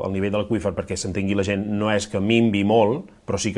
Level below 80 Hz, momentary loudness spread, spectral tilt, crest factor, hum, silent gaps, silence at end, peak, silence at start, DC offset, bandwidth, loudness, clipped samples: -52 dBFS; 8 LU; -5.5 dB/octave; 18 dB; none; none; 0 s; -4 dBFS; 0 s; under 0.1%; 11.5 kHz; -22 LUFS; under 0.1%